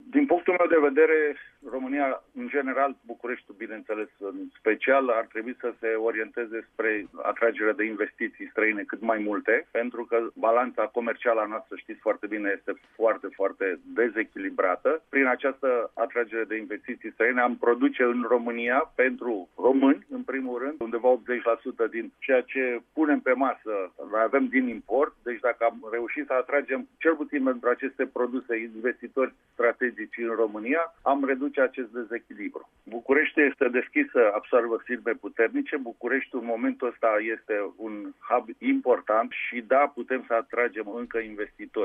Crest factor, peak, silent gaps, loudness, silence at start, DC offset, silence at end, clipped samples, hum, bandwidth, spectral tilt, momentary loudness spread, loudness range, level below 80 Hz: 18 dB; -10 dBFS; none; -26 LUFS; 0.05 s; under 0.1%; 0 s; under 0.1%; none; 3.7 kHz; -7.5 dB/octave; 11 LU; 3 LU; -70 dBFS